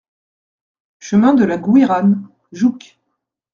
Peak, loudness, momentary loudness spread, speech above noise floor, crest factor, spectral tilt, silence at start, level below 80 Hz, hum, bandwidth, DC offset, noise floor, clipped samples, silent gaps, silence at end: 0 dBFS; -14 LUFS; 7 LU; 61 dB; 16 dB; -7.5 dB/octave; 1.05 s; -60 dBFS; none; 7.4 kHz; under 0.1%; -74 dBFS; under 0.1%; none; 0.75 s